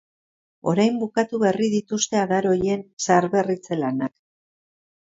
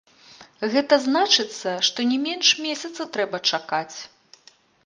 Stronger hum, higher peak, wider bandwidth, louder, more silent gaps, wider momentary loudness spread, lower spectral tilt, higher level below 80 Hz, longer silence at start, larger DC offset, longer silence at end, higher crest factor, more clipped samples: neither; about the same, -4 dBFS vs -2 dBFS; second, 7.8 kHz vs 10.5 kHz; about the same, -22 LUFS vs -21 LUFS; first, 2.93-2.97 s vs none; second, 6 LU vs 12 LU; first, -5 dB/octave vs -1.5 dB/octave; first, -60 dBFS vs -76 dBFS; first, 0.65 s vs 0.4 s; neither; first, 1 s vs 0.8 s; about the same, 20 dB vs 22 dB; neither